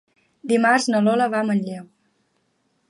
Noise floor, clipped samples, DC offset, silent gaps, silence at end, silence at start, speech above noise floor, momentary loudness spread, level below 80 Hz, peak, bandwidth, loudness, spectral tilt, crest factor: -68 dBFS; under 0.1%; under 0.1%; none; 1.05 s; 0.45 s; 49 dB; 17 LU; -74 dBFS; -4 dBFS; 11.5 kHz; -19 LUFS; -5 dB/octave; 18 dB